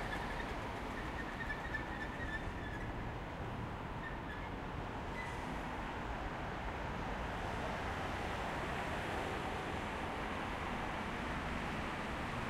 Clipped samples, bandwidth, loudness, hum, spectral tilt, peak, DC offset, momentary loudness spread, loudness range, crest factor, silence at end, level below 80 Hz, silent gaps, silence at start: under 0.1%; 16 kHz; -42 LUFS; none; -5.5 dB/octave; -28 dBFS; under 0.1%; 4 LU; 3 LU; 14 dB; 0 s; -50 dBFS; none; 0 s